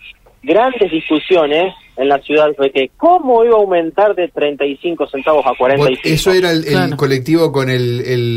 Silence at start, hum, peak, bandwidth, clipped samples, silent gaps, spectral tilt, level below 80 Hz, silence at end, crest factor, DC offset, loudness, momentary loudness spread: 0.05 s; none; -2 dBFS; 16 kHz; under 0.1%; none; -6 dB/octave; -44 dBFS; 0 s; 12 dB; under 0.1%; -13 LUFS; 6 LU